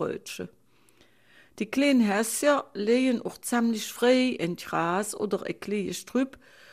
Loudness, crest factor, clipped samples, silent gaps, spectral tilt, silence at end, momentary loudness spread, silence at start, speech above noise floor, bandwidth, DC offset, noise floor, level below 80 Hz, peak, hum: -27 LUFS; 18 dB; under 0.1%; none; -4 dB/octave; 0.45 s; 11 LU; 0 s; 35 dB; 15.5 kHz; under 0.1%; -62 dBFS; -68 dBFS; -10 dBFS; none